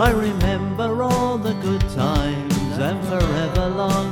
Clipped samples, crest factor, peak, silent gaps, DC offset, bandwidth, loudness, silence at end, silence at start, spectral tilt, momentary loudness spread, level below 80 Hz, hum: under 0.1%; 16 dB; -4 dBFS; none; under 0.1%; 19.5 kHz; -21 LUFS; 0 s; 0 s; -6 dB/octave; 3 LU; -30 dBFS; none